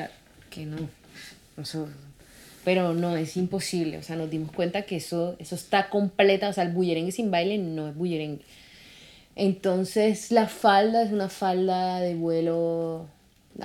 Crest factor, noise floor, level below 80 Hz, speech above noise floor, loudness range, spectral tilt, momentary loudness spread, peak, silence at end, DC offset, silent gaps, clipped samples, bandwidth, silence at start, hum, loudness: 22 dB; -51 dBFS; -62 dBFS; 26 dB; 6 LU; -5.5 dB/octave; 17 LU; -4 dBFS; 0 s; under 0.1%; none; under 0.1%; 16.5 kHz; 0 s; none; -26 LUFS